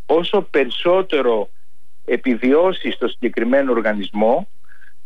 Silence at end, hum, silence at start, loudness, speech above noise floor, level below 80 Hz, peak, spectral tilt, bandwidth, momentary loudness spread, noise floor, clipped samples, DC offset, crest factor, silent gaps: 0.6 s; none; 0.1 s; -18 LUFS; 46 dB; -64 dBFS; -6 dBFS; -7 dB/octave; 6.6 kHz; 7 LU; -64 dBFS; under 0.1%; 5%; 14 dB; none